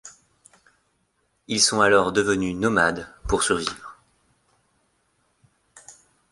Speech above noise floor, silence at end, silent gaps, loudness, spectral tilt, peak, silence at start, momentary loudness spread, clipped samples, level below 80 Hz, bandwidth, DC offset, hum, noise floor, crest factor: 49 dB; 0.4 s; none; -21 LUFS; -3 dB/octave; -4 dBFS; 0.05 s; 15 LU; under 0.1%; -46 dBFS; 11.5 kHz; under 0.1%; none; -70 dBFS; 22 dB